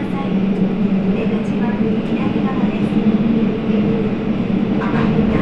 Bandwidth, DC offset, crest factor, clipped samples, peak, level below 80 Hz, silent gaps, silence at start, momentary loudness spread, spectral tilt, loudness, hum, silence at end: 6 kHz; under 0.1%; 12 dB; under 0.1%; -4 dBFS; -36 dBFS; none; 0 s; 3 LU; -9 dB/octave; -17 LUFS; none; 0 s